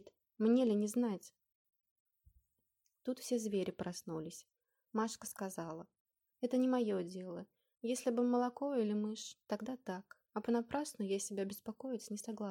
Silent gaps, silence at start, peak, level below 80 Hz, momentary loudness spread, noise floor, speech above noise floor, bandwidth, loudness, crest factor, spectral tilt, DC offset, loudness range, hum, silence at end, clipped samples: 1.55-1.65 s, 1.91-2.06 s, 6.00-6.05 s; 0.05 s; -22 dBFS; -78 dBFS; 13 LU; -84 dBFS; 46 dB; 17 kHz; -39 LUFS; 18 dB; -5.5 dB/octave; under 0.1%; 6 LU; none; 0 s; under 0.1%